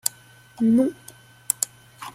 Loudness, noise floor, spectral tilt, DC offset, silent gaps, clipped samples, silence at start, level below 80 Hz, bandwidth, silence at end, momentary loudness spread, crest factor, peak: -23 LUFS; -49 dBFS; -4 dB/octave; under 0.1%; none; under 0.1%; 0.05 s; -64 dBFS; 16.5 kHz; 0.05 s; 17 LU; 26 dB; 0 dBFS